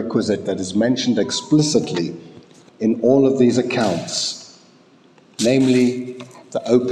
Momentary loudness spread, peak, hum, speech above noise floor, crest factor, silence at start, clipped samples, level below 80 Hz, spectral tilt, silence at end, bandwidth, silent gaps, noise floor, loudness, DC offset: 14 LU; -2 dBFS; none; 33 dB; 16 dB; 0 s; under 0.1%; -66 dBFS; -5 dB/octave; 0 s; 11.5 kHz; none; -51 dBFS; -18 LUFS; under 0.1%